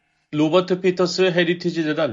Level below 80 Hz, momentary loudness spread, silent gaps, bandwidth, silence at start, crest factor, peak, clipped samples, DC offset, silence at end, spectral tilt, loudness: -66 dBFS; 4 LU; none; 7.6 kHz; 0.3 s; 16 dB; -4 dBFS; under 0.1%; under 0.1%; 0 s; -5.5 dB/octave; -20 LUFS